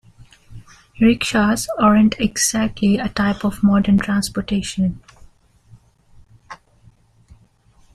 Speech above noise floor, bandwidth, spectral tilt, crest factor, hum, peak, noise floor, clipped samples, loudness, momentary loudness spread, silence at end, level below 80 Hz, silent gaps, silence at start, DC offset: 36 dB; 14.5 kHz; -4.5 dB/octave; 18 dB; none; -2 dBFS; -53 dBFS; under 0.1%; -17 LUFS; 8 LU; 1.4 s; -42 dBFS; none; 0.5 s; under 0.1%